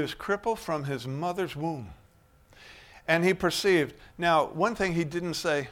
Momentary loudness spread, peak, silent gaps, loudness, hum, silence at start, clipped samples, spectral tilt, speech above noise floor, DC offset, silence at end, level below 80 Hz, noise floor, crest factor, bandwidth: 10 LU; -8 dBFS; none; -28 LUFS; none; 0 s; under 0.1%; -5 dB/octave; 32 dB; under 0.1%; 0 s; -56 dBFS; -60 dBFS; 20 dB; 17 kHz